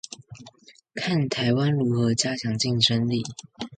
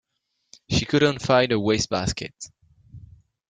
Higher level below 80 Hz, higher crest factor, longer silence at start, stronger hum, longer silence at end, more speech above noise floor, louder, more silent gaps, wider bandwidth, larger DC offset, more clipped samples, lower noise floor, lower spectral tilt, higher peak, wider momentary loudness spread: second, -60 dBFS vs -46 dBFS; about the same, 20 dB vs 20 dB; second, 0.1 s vs 0.7 s; neither; second, 0 s vs 0.5 s; second, 29 dB vs 53 dB; about the same, -23 LUFS vs -22 LUFS; neither; about the same, 9.4 kHz vs 9.6 kHz; neither; neither; second, -52 dBFS vs -76 dBFS; about the same, -4.5 dB/octave vs -4.5 dB/octave; about the same, -6 dBFS vs -4 dBFS; about the same, 17 LU vs 17 LU